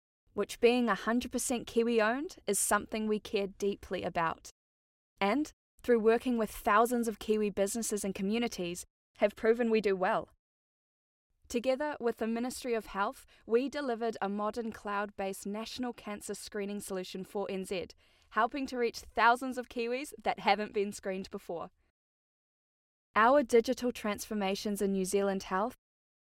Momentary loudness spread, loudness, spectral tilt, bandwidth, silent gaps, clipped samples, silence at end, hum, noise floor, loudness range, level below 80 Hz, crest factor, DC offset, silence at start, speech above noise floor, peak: 12 LU; -32 LUFS; -4 dB/octave; 16.5 kHz; 4.51-5.16 s, 5.53-5.78 s, 8.90-9.14 s, 10.39-11.30 s, 21.90-23.14 s; under 0.1%; 0.6 s; none; under -90 dBFS; 6 LU; -62 dBFS; 20 dB; under 0.1%; 0.35 s; over 58 dB; -14 dBFS